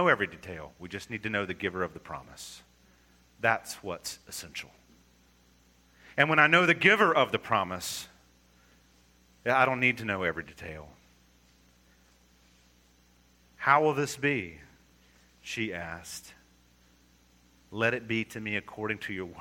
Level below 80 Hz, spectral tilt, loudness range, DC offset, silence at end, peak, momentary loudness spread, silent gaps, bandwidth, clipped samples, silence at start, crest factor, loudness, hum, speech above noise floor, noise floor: -64 dBFS; -4 dB/octave; 11 LU; under 0.1%; 0 s; -6 dBFS; 22 LU; none; 17.5 kHz; under 0.1%; 0 s; 26 dB; -28 LUFS; 60 Hz at -60 dBFS; 34 dB; -63 dBFS